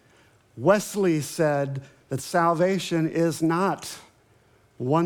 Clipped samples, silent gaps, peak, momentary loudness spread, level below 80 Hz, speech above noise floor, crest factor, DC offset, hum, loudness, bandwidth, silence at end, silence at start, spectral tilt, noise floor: under 0.1%; none; -6 dBFS; 12 LU; -70 dBFS; 36 dB; 20 dB; under 0.1%; none; -24 LUFS; 18.5 kHz; 0 s; 0.55 s; -6 dB/octave; -59 dBFS